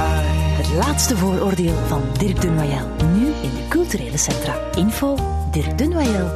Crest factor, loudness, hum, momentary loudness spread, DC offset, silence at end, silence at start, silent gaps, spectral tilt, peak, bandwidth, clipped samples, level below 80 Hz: 14 dB; -19 LUFS; none; 4 LU; under 0.1%; 0 s; 0 s; none; -5.5 dB/octave; -4 dBFS; 14 kHz; under 0.1%; -28 dBFS